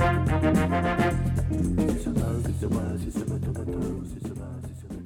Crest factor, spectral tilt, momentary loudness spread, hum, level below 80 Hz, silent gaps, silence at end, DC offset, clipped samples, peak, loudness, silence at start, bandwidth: 16 dB; -7.5 dB/octave; 13 LU; none; -36 dBFS; none; 0 s; under 0.1%; under 0.1%; -10 dBFS; -27 LUFS; 0 s; 16 kHz